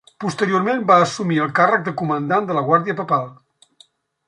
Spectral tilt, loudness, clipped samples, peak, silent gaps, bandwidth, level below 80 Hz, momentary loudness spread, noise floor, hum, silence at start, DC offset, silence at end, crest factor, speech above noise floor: -6 dB/octave; -18 LUFS; under 0.1%; -2 dBFS; none; 11.5 kHz; -66 dBFS; 8 LU; -55 dBFS; none; 0.2 s; under 0.1%; 0.95 s; 18 dB; 37 dB